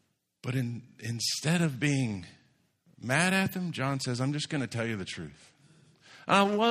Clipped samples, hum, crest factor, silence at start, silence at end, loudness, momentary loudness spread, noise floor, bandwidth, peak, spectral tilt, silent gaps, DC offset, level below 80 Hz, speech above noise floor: under 0.1%; none; 22 dB; 0.45 s; 0 s; -30 LUFS; 16 LU; -68 dBFS; 15.5 kHz; -8 dBFS; -4.5 dB/octave; none; under 0.1%; -68 dBFS; 38 dB